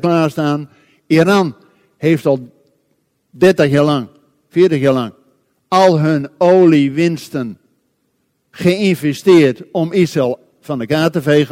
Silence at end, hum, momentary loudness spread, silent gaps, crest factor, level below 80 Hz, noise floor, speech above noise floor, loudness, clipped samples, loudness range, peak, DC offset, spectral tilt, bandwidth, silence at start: 0.05 s; none; 12 LU; none; 14 dB; -56 dBFS; -65 dBFS; 52 dB; -14 LUFS; under 0.1%; 3 LU; 0 dBFS; under 0.1%; -7 dB/octave; 16 kHz; 0.05 s